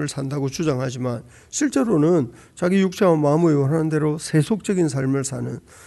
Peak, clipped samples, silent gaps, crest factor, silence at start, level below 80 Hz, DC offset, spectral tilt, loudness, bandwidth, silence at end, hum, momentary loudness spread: -6 dBFS; under 0.1%; none; 14 dB; 0 s; -56 dBFS; under 0.1%; -6.5 dB/octave; -21 LUFS; 12 kHz; 0.05 s; none; 10 LU